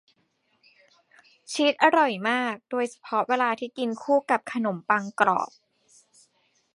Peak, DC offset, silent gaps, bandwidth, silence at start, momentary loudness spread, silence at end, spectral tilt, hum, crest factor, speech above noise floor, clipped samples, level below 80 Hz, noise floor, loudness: -2 dBFS; under 0.1%; none; 11.5 kHz; 1.5 s; 10 LU; 1.3 s; -4 dB/octave; none; 24 dB; 46 dB; under 0.1%; -80 dBFS; -70 dBFS; -25 LUFS